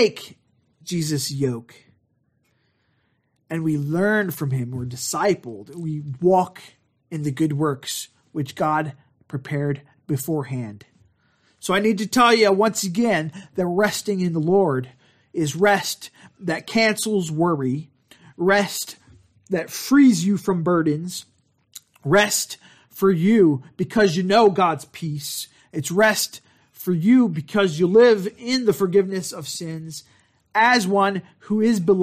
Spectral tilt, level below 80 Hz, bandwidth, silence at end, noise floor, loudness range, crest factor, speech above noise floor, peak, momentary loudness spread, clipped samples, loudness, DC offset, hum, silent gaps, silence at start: -5 dB/octave; -62 dBFS; 15.5 kHz; 0 s; -68 dBFS; 7 LU; 18 dB; 48 dB; -4 dBFS; 16 LU; under 0.1%; -21 LUFS; under 0.1%; none; none; 0 s